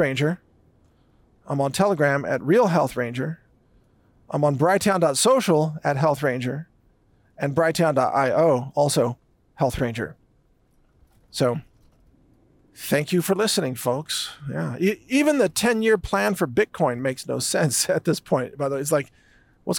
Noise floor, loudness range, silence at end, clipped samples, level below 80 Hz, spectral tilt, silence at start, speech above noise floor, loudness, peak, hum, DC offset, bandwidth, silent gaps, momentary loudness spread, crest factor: -61 dBFS; 5 LU; 0 s; under 0.1%; -54 dBFS; -4.5 dB/octave; 0 s; 40 dB; -22 LUFS; -8 dBFS; none; under 0.1%; 18 kHz; none; 11 LU; 14 dB